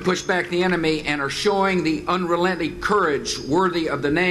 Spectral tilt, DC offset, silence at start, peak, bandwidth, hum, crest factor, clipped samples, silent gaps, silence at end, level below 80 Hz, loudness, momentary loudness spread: -4.5 dB/octave; under 0.1%; 0 s; -6 dBFS; 13 kHz; none; 14 dB; under 0.1%; none; 0 s; -46 dBFS; -21 LUFS; 3 LU